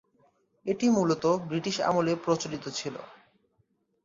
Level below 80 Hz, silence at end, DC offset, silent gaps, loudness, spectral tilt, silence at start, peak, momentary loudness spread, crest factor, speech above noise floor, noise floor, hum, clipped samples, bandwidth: -68 dBFS; 0.9 s; under 0.1%; none; -28 LUFS; -5 dB/octave; 0.65 s; -14 dBFS; 12 LU; 16 dB; 45 dB; -72 dBFS; none; under 0.1%; 7.8 kHz